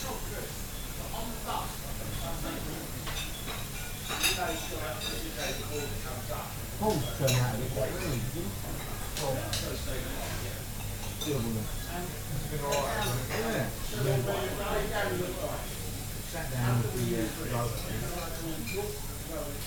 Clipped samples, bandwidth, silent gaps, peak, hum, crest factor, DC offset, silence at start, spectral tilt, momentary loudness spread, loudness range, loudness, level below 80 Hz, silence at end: under 0.1%; 19.5 kHz; none; -14 dBFS; 50 Hz at -45 dBFS; 20 dB; under 0.1%; 0 s; -4 dB/octave; 8 LU; 3 LU; -33 LUFS; -42 dBFS; 0 s